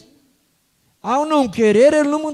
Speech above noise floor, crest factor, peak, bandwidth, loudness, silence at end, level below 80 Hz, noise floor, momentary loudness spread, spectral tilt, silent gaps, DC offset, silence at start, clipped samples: 48 dB; 14 dB; -2 dBFS; 12.5 kHz; -15 LUFS; 0 s; -58 dBFS; -63 dBFS; 9 LU; -5 dB/octave; none; under 0.1%; 1.05 s; under 0.1%